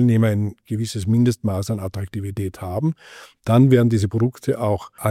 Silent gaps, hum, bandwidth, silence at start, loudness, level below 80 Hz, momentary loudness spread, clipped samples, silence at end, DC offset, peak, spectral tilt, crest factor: none; none; 14.5 kHz; 0 s; -21 LUFS; -52 dBFS; 13 LU; under 0.1%; 0 s; under 0.1%; -4 dBFS; -7.5 dB/octave; 16 dB